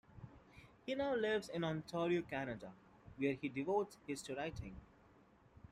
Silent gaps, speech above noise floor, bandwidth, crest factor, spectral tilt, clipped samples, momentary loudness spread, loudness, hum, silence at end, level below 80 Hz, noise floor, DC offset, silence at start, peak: none; 27 dB; 14 kHz; 18 dB; -6 dB/octave; under 0.1%; 21 LU; -41 LUFS; none; 0.15 s; -66 dBFS; -67 dBFS; under 0.1%; 0.15 s; -24 dBFS